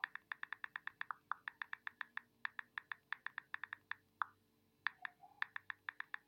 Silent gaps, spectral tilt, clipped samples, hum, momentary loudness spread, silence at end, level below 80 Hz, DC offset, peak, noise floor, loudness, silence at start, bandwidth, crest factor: none; -2 dB/octave; under 0.1%; none; 4 LU; 0.1 s; under -90 dBFS; under 0.1%; -20 dBFS; -77 dBFS; -48 LUFS; 0.05 s; 16.5 kHz; 30 dB